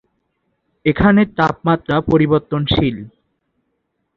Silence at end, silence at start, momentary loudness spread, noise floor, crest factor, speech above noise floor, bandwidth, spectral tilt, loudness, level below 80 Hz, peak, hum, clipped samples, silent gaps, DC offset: 1.1 s; 0.85 s; 8 LU; -70 dBFS; 16 dB; 55 dB; 6.8 kHz; -8.5 dB/octave; -16 LUFS; -38 dBFS; -2 dBFS; none; under 0.1%; none; under 0.1%